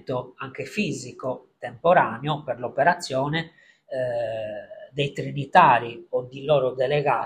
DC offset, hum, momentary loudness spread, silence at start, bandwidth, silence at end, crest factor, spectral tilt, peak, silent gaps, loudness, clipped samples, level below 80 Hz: under 0.1%; none; 16 LU; 0.1 s; 13 kHz; 0 s; 22 dB; -5.5 dB/octave; -2 dBFS; none; -24 LUFS; under 0.1%; -62 dBFS